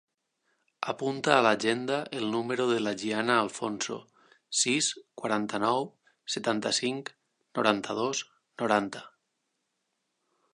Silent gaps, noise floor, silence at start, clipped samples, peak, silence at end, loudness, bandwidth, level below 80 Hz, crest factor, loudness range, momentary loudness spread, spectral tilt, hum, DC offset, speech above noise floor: none; -80 dBFS; 0.8 s; under 0.1%; -4 dBFS; 1.45 s; -29 LUFS; 11 kHz; -76 dBFS; 26 dB; 4 LU; 13 LU; -3 dB/octave; none; under 0.1%; 52 dB